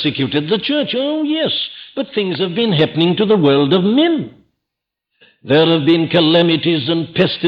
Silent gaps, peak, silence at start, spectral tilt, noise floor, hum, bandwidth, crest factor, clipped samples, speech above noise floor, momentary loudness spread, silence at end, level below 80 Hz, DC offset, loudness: none; -2 dBFS; 0 s; -8.5 dB/octave; -80 dBFS; none; 5.4 kHz; 14 dB; under 0.1%; 65 dB; 8 LU; 0 s; -58 dBFS; under 0.1%; -15 LUFS